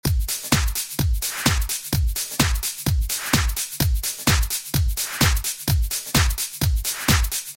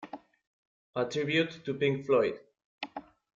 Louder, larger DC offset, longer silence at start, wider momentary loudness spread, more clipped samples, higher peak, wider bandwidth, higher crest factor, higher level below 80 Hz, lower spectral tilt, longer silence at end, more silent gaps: first, -22 LUFS vs -30 LUFS; neither; about the same, 0.05 s vs 0 s; second, 4 LU vs 20 LU; neither; first, -4 dBFS vs -14 dBFS; first, 17 kHz vs 7.6 kHz; about the same, 18 dB vs 18 dB; first, -26 dBFS vs -72 dBFS; second, -3 dB/octave vs -6 dB/octave; second, 0 s vs 0.35 s; second, none vs 0.47-0.93 s, 2.64-2.78 s